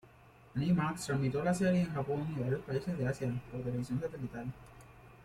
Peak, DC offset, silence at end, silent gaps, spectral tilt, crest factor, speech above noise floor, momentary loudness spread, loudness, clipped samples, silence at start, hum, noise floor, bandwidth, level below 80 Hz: -18 dBFS; under 0.1%; 0 s; none; -7 dB/octave; 16 dB; 25 dB; 11 LU; -35 LUFS; under 0.1%; 0.05 s; none; -59 dBFS; 14 kHz; -60 dBFS